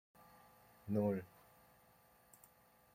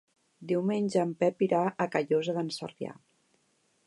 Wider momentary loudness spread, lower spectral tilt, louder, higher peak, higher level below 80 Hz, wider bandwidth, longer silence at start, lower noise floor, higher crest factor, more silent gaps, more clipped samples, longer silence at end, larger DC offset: first, 27 LU vs 13 LU; first, -8.5 dB/octave vs -6.5 dB/octave; second, -40 LUFS vs -29 LUFS; second, -26 dBFS vs -10 dBFS; about the same, -80 dBFS vs -80 dBFS; first, 16.5 kHz vs 11.5 kHz; first, 0.85 s vs 0.4 s; about the same, -69 dBFS vs -71 dBFS; about the same, 20 dB vs 20 dB; neither; neither; first, 1.7 s vs 0.95 s; neither